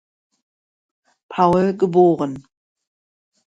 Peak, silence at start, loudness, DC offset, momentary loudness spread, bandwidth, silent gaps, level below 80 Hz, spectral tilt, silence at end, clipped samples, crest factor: -2 dBFS; 1.3 s; -17 LUFS; under 0.1%; 14 LU; 7.8 kHz; none; -56 dBFS; -8.5 dB/octave; 1.2 s; under 0.1%; 20 dB